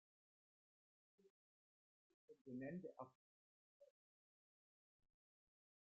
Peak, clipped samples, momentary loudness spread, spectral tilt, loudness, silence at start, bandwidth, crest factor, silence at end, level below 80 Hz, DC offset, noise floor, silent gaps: -40 dBFS; under 0.1%; 10 LU; -5.5 dB/octave; -55 LUFS; 1.2 s; 2.7 kHz; 22 dB; 2 s; under -90 dBFS; under 0.1%; under -90 dBFS; 1.30-2.28 s, 2.41-2.45 s, 3.15-3.80 s